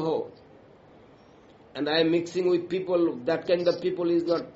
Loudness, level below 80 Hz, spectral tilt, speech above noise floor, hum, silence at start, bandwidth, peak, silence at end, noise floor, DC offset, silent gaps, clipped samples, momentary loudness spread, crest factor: -26 LUFS; -68 dBFS; -4 dB/octave; 28 dB; none; 0 s; 8 kHz; -10 dBFS; 0.05 s; -54 dBFS; under 0.1%; none; under 0.1%; 8 LU; 16 dB